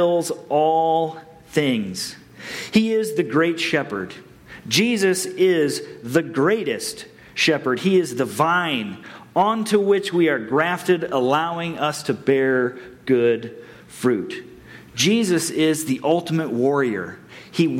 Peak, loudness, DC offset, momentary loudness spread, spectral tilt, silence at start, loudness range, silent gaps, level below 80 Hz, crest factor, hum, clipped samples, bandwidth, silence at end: -4 dBFS; -21 LUFS; under 0.1%; 14 LU; -4.5 dB/octave; 0 s; 2 LU; none; -62 dBFS; 16 dB; none; under 0.1%; 16.5 kHz; 0 s